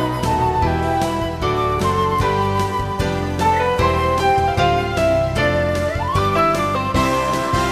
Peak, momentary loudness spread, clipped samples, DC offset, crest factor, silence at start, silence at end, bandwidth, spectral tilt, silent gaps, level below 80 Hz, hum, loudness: -4 dBFS; 4 LU; under 0.1%; 0.4%; 14 dB; 0 s; 0 s; 15.5 kHz; -5.5 dB/octave; none; -32 dBFS; none; -18 LUFS